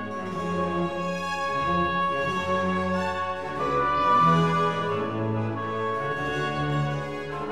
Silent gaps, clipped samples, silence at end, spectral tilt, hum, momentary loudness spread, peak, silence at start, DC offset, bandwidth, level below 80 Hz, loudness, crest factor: none; under 0.1%; 0 s; -6.5 dB/octave; none; 9 LU; -10 dBFS; 0 s; 0.4%; 12.5 kHz; -52 dBFS; -26 LUFS; 16 dB